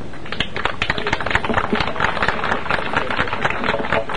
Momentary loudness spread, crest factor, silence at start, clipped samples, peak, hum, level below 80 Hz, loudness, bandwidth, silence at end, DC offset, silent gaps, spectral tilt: 3 LU; 20 dB; 0 s; under 0.1%; -2 dBFS; none; -38 dBFS; -20 LUFS; 10.5 kHz; 0 s; 6%; none; -5 dB/octave